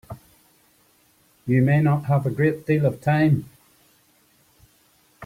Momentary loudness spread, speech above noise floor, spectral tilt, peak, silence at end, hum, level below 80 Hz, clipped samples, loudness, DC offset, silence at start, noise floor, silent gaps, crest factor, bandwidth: 13 LU; 40 dB; -9 dB/octave; -6 dBFS; 0 s; none; -58 dBFS; under 0.1%; -21 LUFS; under 0.1%; 0.1 s; -60 dBFS; none; 16 dB; 15 kHz